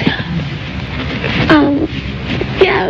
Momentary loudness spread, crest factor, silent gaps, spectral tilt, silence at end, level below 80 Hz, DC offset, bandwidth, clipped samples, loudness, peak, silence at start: 12 LU; 14 dB; none; -7 dB/octave; 0 s; -30 dBFS; under 0.1%; 7.4 kHz; under 0.1%; -15 LUFS; 0 dBFS; 0 s